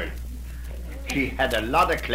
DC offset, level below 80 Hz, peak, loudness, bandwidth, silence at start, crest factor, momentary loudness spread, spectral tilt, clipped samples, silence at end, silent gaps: 0.2%; -34 dBFS; -8 dBFS; -24 LUFS; 16 kHz; 0 s; 18 dB; 16 LU; -4.5 dB/octave; under 0.1%; 0 s; none